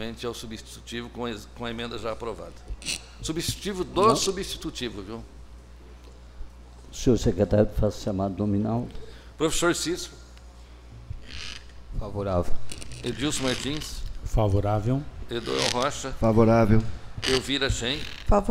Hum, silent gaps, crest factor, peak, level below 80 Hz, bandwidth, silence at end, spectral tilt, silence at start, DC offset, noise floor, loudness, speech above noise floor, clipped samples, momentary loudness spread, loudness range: none; none; 22 dB; -4 dBFS; -36 dBFS; 16 kHz; 0 s; -5 dB/octave; 0 s; under 0.1%; -46 dBFS; -27 LUFS; 21 dB; under 0.1%; 18 LU; 8 LU